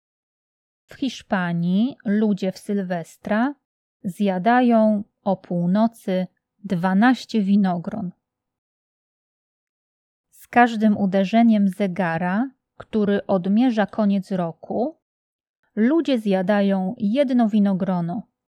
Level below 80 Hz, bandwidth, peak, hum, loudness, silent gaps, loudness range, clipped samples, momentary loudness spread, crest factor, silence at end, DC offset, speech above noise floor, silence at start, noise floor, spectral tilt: -68 dBFS; 11.5 kHz; -2 dBFS; none; -21 LUFS; 3.65-4.00 s, 8.58-10.24 s, 15.02-15.39 s, 15.49-15.63 s; 4 LU; under 0.1%; 11 LU; 20 dB; 0.35 s; under 0.1%; over 70 dB; 0.9 s; under -90 dBFS; -7.5 dB/octave